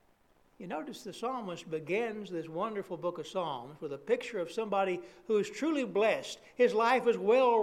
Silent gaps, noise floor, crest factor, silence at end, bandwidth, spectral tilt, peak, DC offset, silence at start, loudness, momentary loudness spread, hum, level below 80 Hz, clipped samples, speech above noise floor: none; -67 dBFS; 18 dB; 0 s; 13.5 kHz; -5 dB/octave; -14 dBFS; under 0.1%; 0.6 s; -33 LUFS; 13 LU; none; -74 dBFS; under 0.1%; 35 dB